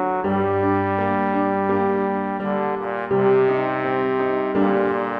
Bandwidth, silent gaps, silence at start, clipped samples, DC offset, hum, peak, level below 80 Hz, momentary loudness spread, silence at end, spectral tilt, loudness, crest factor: 5 kHz; none; 0 s; under 0.1%; under 0.1%; none; -8 dBFS; -58 dBFS; 5 LU; 0 s; -9.5 dB/octave; -21 LUFS; 14 dB